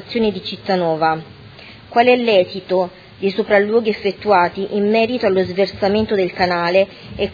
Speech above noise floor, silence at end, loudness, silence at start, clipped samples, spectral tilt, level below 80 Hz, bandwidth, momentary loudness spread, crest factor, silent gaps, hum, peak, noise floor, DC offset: 23 dB; 0 s; -17 LUFS; 0 s; under 0.1%; -7 dB/octave; -48 dBFS; 5 kHz; 8 LU; 18 dB; none; none; 0 dBFS; -39 dBFS; under 0.1%